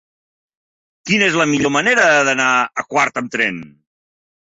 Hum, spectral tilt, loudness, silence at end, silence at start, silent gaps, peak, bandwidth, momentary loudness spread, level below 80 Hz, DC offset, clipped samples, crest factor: none; -3.5 dB/octave; -15 LUFS; 0.85 s; 1.05 s; none; -2 dBFS; 8 kHz; 7 LU; -58 dBFS; under 0.1%; under 0.1%; 16 dB